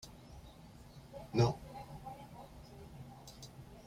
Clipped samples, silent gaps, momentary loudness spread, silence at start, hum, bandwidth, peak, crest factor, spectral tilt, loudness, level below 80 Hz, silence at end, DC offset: under 0.1%; none; 23 LU; 0 s; none; 15.5 kHz; -18 dBFS; 24 dB; -6.5 dB/octave; -38 LUFS; -60 dBFS; 0 s; under 0.1%